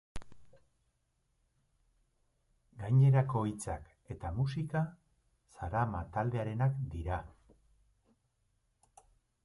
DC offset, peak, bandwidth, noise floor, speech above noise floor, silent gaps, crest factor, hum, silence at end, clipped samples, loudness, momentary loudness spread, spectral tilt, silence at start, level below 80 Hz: under 0.1%; -16 dBFS; 11.5 kHz; -78 dBFS; 46 dB; none; 20 dB; none; 2.15 s; under 0.1%; -34 LUFS; 18 LU; -8 dB/octave; 0.15 s; -54 dBFS